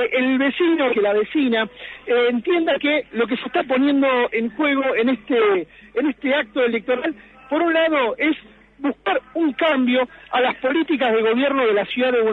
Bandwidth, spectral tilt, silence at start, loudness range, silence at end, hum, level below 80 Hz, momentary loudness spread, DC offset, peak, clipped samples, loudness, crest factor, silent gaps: 4.4 kHz; -6.5 dB/octave; 0 s; 2 LU; 0 s; none; -58 dBFS; 6 LU; under 0.1%; -8 dBFS; under 0.1%; -20 LUFS; 12 dB; none